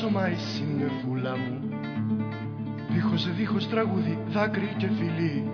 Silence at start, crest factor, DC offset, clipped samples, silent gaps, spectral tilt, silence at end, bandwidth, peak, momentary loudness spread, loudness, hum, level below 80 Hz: 0 s; 16 dB; under 0.1%; under 0.1%; none; -7.5 dB/octave; 0 s; 5.4 kHz; -12 dBFS; 6 LU; -28 LUFS; none; -62 dBFS